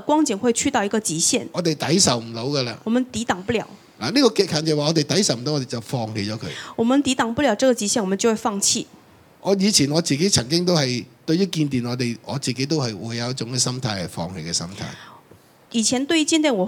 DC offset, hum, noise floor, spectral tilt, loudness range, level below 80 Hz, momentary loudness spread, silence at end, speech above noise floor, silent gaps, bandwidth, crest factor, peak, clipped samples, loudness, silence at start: under 0.1%; none; -51 dBFS; -4 dB/octave; 5 LU; -56 dBFS; 10 LU; 0 s; 30 dB; none; 18 kHz; 20 dB; 0 dBFS; under 0.1%; -21 LUFS; 0 s